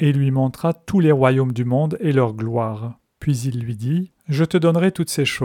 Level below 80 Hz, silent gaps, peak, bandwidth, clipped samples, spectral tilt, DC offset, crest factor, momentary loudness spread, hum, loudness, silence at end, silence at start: -52 dBFS; none; -2 dBFS; 17 kHz; under 0.1%; -7 dB/octave; under 0.1%; 18 dB; 9 LU; none; -20 LUFS; 0 s; 0 s